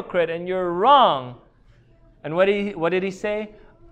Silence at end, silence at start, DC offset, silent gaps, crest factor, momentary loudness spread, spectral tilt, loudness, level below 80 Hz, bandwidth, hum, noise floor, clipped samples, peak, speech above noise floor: 0.4 s; 0 s; under 0.1%; none; 20 dB; 16 LU; -6 dB/octave; -21 LUFS; -54 dBFS; 8.8 kHz; none; -54 dBFS; under 0.1%; -2 dBFS; 33 dB